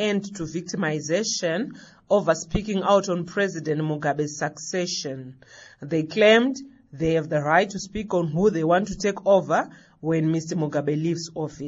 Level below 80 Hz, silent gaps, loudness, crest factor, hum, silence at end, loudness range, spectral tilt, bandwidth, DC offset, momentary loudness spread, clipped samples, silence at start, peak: -48 dBFS; none; -24 LUFS; 20 dB; none; 0 s; 3 LU; -4.5 dB/octave; 8 kHz; under 0.1%; 12 LU; under 0.1%; 0 s; -4 dBFS